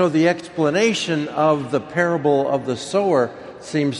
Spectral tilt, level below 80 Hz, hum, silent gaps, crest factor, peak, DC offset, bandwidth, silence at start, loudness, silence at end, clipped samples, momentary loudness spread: -5.5 dB/octave; -62 dBFS; none; none; 16 dB; -4 dBFS; under 0.1%; 11.5 kHz; 0 s; -20 LUFS; 0 s; under 0.1%; 5 LU